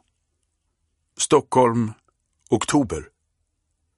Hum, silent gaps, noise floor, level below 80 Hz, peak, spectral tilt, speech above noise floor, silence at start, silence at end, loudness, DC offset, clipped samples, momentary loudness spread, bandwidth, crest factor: none; none; -73 dBFS; -52 dBFS; -4 dBFS; -5 dB/octave; 54 dB; 1.2 s; 0.95 s; -21 LUFS; under 0.1%; under 0.1%; 11 LU; 11.5 kHz; 20 dB